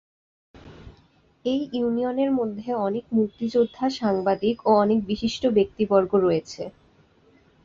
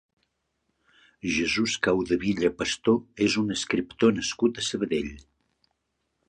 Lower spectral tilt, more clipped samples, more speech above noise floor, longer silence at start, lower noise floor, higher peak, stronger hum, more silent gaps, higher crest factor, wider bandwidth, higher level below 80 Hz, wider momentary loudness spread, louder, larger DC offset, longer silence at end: first, -6.5 dB/octave vs -4 dB/octave; neither; second, 36 dB vs 52 dB; second, 0.65 s vs 1.25 s; second, -59 dBFS vs -78 dBFS; about the same, -6 dBFS vs -8 dBFS; neither; neither; about the same, 18 dB vs 20 dB; second, 7.6 kHz vs 10.5 kHz; about the same, -56 dBFS vs -54 dBFS; about the same, 7 LU vs 5 LU; first, -23 LUFS vs -26 LUFS; neither; second, 0.95 s vs 1.1 s